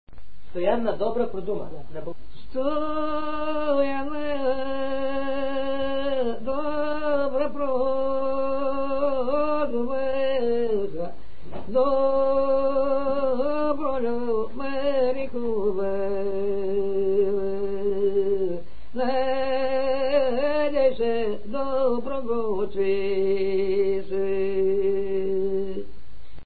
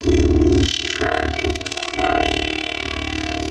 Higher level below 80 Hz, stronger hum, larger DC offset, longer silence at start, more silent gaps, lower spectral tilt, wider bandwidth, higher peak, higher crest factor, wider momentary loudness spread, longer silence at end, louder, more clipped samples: second, -50 dBFS vs -26 dBFS; neither; first, 5% vs under 0.1%; about the same, 0.05 s vs 0 s; neither; first, -10 dB/octave vs -5 dB/octave; second, 4.8 kHz vs 11 kHz; second, -8 dBFS vs -4 dBFS; about the same, 16 dB vs 16 dB; about the same, 7 LU vs 8 LU; about the same, 0 s vs 0 s; second, -25 LUFS vs -19 LUFS; neither